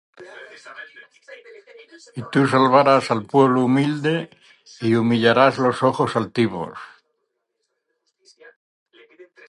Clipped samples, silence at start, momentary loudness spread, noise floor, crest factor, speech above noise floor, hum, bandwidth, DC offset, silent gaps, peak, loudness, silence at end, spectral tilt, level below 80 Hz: under 0.1%; 0.2 s; 24 LU; -75 dBFS; 20 dB; 56 dB; none; 11.5 kHz; under 0.1%; 8.56-8.86 s; 0 dBFS; -18 LUFS; 0.25 s; -6.5 dB/octave; -64 dBFS